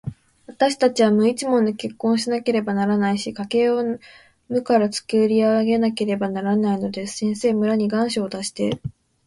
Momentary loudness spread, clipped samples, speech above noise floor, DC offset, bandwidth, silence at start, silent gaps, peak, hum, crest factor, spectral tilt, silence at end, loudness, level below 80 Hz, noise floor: 8 LU; under 0.1%; 25 dB; under 0.1%; 11.5 kHz; 0.05 s; none; -4 dBFS; none; 16 dB; -5.5 dB/octave; 0.35 s; -21 LUFS; -58 dBFS; -45 dBFS